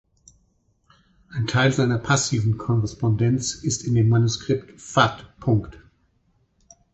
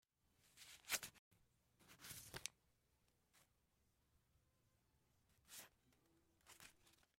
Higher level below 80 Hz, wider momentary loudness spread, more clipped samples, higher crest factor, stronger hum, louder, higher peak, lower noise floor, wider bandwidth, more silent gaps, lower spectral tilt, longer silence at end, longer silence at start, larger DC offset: first, -48 dBFS vs -82 dBFS; second, 7 LU vs 20 LU; neither; second, 20 dB vs 34 dB; neither; first, -22 LUFS vs -52 LUFS; first, -2 dBFS vs -26 dBFS; second, -65 dBFS vs -83 dBFS; second, 8.2 kHz vs 16 kHz; second, none vs 1.19-1.31 s; first, -5 dB/octave vs -0.5 dB/octave; first, 1.2 s vs 0.25 s; first, 1.3 s vs 0.4 s; neither